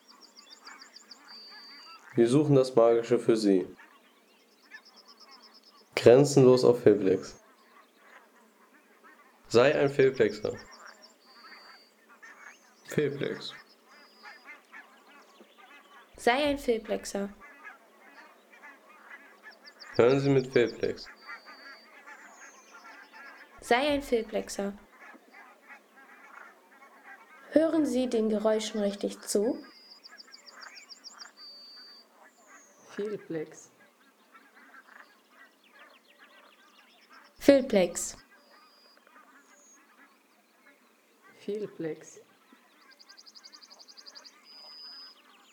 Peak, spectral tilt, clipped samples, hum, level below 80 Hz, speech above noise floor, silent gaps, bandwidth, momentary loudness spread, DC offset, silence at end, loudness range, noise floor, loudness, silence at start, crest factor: -6 dBFS; -5.5 dB/octave; under 0.1%; none; -66 dBFS; 39 dB; none; 19.5 kHz; 27 LU; under 0.1%; 0.45 s; 18 LU; -64 dBFS; -27 LUFS; 0.7 s; 24 dB